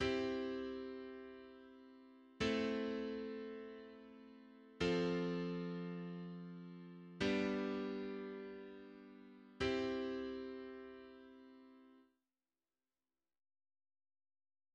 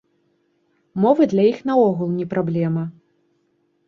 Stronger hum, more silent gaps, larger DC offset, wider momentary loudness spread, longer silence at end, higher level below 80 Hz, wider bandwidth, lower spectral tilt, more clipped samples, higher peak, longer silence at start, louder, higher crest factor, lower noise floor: neither; neither; neither; first, 22 LU vs 10 LU; first, 2.7 s vs 0.95 s; about the same, -68 dBFS vs -64 dBFS; first, 9.4 kHz vs 7 kHz; second, -6 dB/octave vs -9 dB/octave; neither; second, -24 dBFS vs -2 dBFS; second, 0 s vs 0.95 s; second, -43 LUFS vs -19 LUFS; about the same, 20 dB vs 18 dB; first, under -90 dBFS vs -66 dBFS